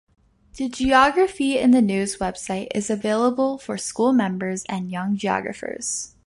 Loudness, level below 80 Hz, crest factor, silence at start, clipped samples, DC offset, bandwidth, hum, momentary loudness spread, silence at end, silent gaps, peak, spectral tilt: -22 LUFS; -50 dBFS; 18 dB; 0.55 s; under 0.1%; under 0.1%; 11.5 kHz; none; 11 LU; 0.2 s; none; -4 dBFS; -4.5 dB/octave